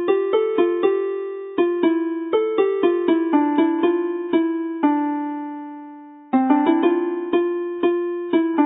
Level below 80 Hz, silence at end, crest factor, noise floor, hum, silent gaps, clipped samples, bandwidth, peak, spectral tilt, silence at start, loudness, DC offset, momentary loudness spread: -74 dBFS; 0 s; 16 dB; -40 dBFS; none; none; under 0.1%; 3.9 kHz; -4 dBFS; -10 dB/octave; 0 s; -20 LUFS; under 0.1%; 9 LU